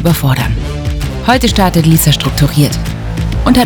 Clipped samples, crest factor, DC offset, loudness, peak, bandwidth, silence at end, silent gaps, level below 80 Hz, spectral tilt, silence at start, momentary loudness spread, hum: 1%; 10 dB; under 0.1%; -12 LUFS; 0 dBFS; over 20 kHz; 0 s; none; -20 dBFS; -5 dB/octave; 0 s; 10 LU; none